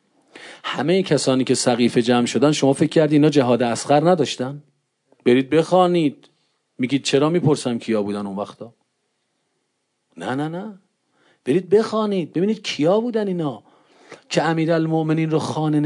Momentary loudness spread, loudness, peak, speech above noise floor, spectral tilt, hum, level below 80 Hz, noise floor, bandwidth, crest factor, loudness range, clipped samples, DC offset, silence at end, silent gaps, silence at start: 12 LU; -19 LUFS; -4 dBFS; 54 dB; -5.5 dB/octave; none; -70 dBFS; -73 dBFS; 11 kHz; 16 dB; 9 LU; under 0.1%; under 0.1%; 0 s; none; 0.35 s